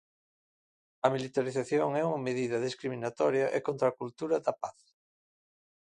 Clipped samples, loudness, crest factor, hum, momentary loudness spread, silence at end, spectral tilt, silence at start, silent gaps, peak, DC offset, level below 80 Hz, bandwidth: under 0.1%; -31 LUFS; 24 dB; none; 7 LU; 1.15 s; -6 dB/octave; 1.05 s; none; -10 dBFS; under 0.1%; -76 dBFS; 11 kHz